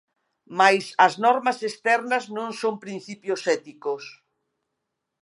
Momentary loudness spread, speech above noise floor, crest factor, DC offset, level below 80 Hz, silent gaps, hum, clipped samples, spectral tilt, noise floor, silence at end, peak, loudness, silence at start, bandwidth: 15 LU; 58 dB; 22 dB; under 0.1%; -82 dBFS; none; none; under 0.1%; -3.5 dB/octave; -81 dBFS; 1.1 s; -2 dBFS; -23 LUFS; 0.5 s; 11.5 kHz